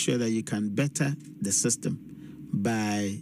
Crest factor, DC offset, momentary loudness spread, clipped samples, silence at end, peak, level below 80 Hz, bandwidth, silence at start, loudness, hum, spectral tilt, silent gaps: 14 dB; under 0.1%; 10 LU; under 0.1%; 0 s; -14 dBFS; -68 dBFS; 15.5 kHz; 0 s; -28 LUFS; none; -4.5 dB/octave; none